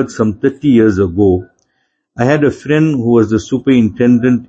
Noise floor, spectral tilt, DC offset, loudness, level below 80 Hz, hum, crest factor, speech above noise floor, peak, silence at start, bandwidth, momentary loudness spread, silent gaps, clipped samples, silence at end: -65 dBFS; -7.5 dB/octave; under 0.1%; -12 LUFS; -44 dBFS; none; 12 dB; 54 dB; 0 dBFS; 0 s; 7.8 kHz; 5 LU; none; under 0.1%; 0.05 s